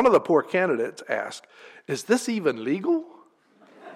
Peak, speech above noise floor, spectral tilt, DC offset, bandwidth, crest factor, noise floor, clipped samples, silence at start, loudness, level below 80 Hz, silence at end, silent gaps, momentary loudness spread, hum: -8 dBFS; 33 dB; -5 dB/octave; under 0.1%; 15 kHz; 18 dB; -57 dBFS; under 0.1%; 0 s; -25 LUFS; -68 dBFS; 0 s; none; 13 LU; none